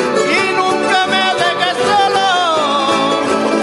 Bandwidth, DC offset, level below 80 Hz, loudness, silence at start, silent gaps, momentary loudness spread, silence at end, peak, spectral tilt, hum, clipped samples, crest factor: 11.5 kHz; under 0.1%; -58 dBFS; -13 LUFS; 0 s; none; 2 LU; 0 s; 0 dBFS; -3 dB/octave; none; under 0.1%; 14 dB